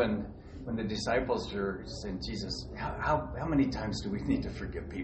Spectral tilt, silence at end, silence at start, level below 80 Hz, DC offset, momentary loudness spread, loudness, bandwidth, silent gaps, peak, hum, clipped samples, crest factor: -6 dB/octave; 0 s; 0 s; -46 dBFS; under 0.1%; 9 LU; -34 LUFS; 8.4 kHz; none; -16 dBFS; none; under 0.1%; 18 dB